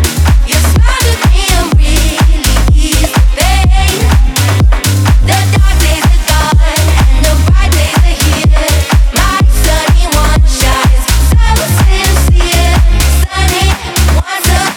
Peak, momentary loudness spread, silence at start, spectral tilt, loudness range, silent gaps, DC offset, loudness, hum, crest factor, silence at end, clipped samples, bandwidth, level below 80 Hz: 0 dBFS; 1 LU; 0 s; -4 dB/octave; 0 LU; none; under 0.1%; -9 LUFS; none; 8 dB; 0 s; under 0.1%; 19 kHz; -8 dBFS